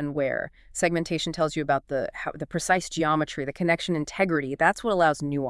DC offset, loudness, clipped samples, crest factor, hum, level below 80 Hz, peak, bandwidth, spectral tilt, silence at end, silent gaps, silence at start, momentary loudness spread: under 0.1%; -26 LUFS; under 0.1%; 20 dB; none; -52 dBFS; -6 dBFS; 12 kHz; -4.5 dB/octave; 0 s; none; 0 s; 8 LU